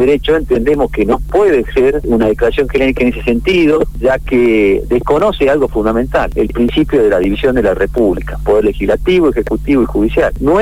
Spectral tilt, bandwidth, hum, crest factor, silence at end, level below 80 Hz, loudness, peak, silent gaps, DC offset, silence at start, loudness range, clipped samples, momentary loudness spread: -7 dB/octave; 15.5 kHz; none; 10 dB; 0 s; -24 dBFS; -12 LUFS; -2 dBFS; none; 2%; 0 s; 1 LU; under 0.1%; 3 LU